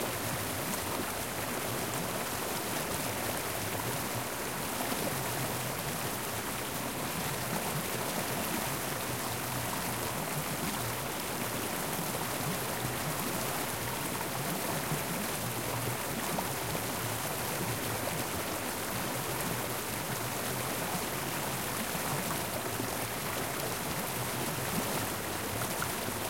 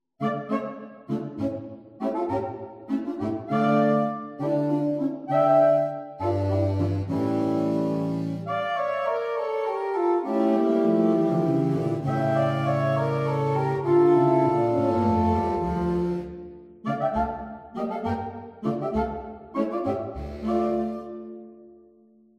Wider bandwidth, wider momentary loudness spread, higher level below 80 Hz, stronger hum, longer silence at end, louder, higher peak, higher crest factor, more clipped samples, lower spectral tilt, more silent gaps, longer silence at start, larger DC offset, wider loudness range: first, 16.5 kHz vs 9 kHz; second, 2 LU vs 12 LU; second, -56 dBFS vs -48 dBFS; neither; second, 0 s vs 0.7 s; second, -33 LUFS vs -25 LUFS; second, -16 dBFS vs -10 dBFS; about the same, 18 dB vs 16 dB; neither; second, -3 dB/octave vs -9 dB/octave; neither; second, 0 s vs 0.2 s; first, 0.2% vs under 0.1%; second, 0 LU vs 7 LU